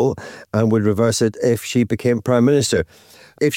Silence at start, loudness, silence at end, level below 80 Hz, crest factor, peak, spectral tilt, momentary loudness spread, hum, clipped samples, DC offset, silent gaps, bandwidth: 0 s; -18 LUFS; 0 s; -48 dBFS; 12 dB; -6 dBFS; -5.5 dB/octave; 7 LU; none; under 0.1%; under 0.1%; none; 17 kHz